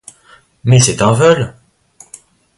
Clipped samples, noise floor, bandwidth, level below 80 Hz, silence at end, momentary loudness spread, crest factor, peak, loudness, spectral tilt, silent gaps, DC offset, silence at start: under 0.1%; -47 dBFS; 11.5 kHz; -44 dBFS; 1.05 s; 12 LU; 14 dB; 0 dBFS; -11 LUFS; -5 dB/octave; none; under 0.1%; 0.65 s